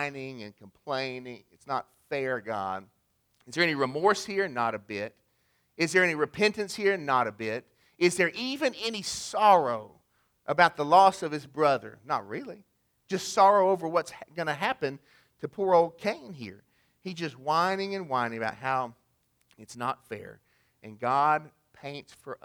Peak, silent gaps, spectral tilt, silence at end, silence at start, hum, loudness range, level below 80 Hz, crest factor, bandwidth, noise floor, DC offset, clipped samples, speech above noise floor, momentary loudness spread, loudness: -6 dBFS; none; -4 dB/octave; 0.1 s; 0 s; none; 8 LU; -72 dBFS; 24 dB; 20 kHz; -72 dBFS; under 0.1%; under 0.1%; 44 dB; 19 LU; -27 LUFS